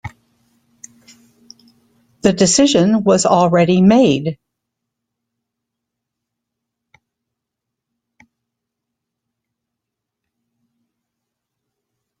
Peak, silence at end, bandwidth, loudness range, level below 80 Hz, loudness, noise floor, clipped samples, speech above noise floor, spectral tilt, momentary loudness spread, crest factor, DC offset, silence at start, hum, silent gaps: 0 dBFS; 7.85 s; 9.6 kHz; 6 LU; -54 dBFS; -13 LUFS; -81 dBFS; under 0.1%; 69 dB; -5 dB/octave; 12 LU; 20 dB; under 0.1%; 0.05 s; none; none